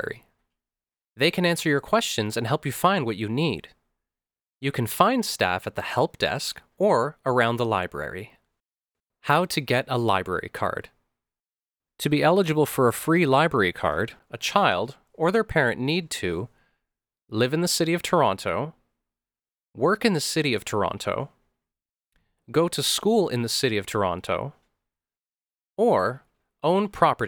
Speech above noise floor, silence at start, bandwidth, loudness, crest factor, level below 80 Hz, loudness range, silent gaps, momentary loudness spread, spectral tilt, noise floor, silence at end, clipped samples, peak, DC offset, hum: over 66 dB; 0 s; over 20 kHz; -24 LUFS; 24 dB; -56 dBFS; 4 LU; none; 10 LU; -4.5 dB/octave; under -90 dBFS; 0 s; under 0.1%; -2 dBFS; under 0.1%; none